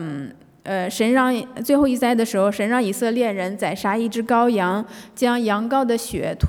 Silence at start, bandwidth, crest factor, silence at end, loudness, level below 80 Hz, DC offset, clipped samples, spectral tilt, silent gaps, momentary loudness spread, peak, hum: 0 s; 18.5 kHz; 16 dB; 0 s; -20 LUFS; -54 dBFS; under 0.1%; under 0.1%; -5.5 dB/octave; none; 9 LU; -6 dBFS; none